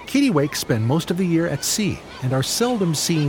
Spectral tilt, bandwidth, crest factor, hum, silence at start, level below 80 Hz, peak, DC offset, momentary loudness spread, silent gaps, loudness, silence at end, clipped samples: -4.5 dB/octave; 19.5 kHz; 14 dB; none; 0 s; -50 dBFS; -6 dBFS; under 0.1%; 4 LU; none; -21 LUFS; 0 s; under 0.1%